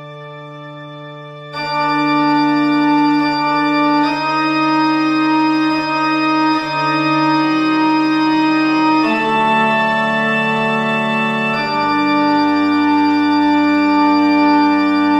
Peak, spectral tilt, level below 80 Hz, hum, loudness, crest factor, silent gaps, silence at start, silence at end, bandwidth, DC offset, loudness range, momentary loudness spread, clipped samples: -2 dBFS; -6 dB/octave; -58 dBFS; none; -14 LUFS; 12 dB; none; 0 s; 0 s; 8.4 kHz; under 0.1%; 1 LU; 6 LU; under 0.1%